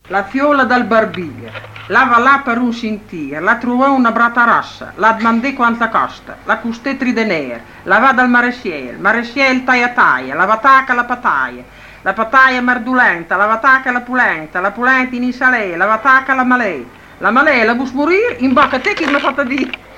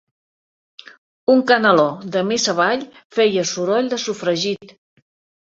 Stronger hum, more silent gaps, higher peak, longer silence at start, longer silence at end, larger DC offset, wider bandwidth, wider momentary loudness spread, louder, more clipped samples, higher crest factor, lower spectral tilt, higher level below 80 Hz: neither; second, none vs 3.05-3.10 s; about the same, 0 dBFS vs -2 dBFS; second, 0.1 s vs 1.3 s; second, 0 s vs 0.75 s; neither; first, 9.6 kHz vs 7.8 kHz; about the same, 11 LU vs 10 LU; first, -13 LUFS vs -18 LUFS; neither; about the same, 14 dB vs 18 dB; first, -5 dB/octave vs -3.5 dB/octave; first, -48 dBFS vs -66 dBFS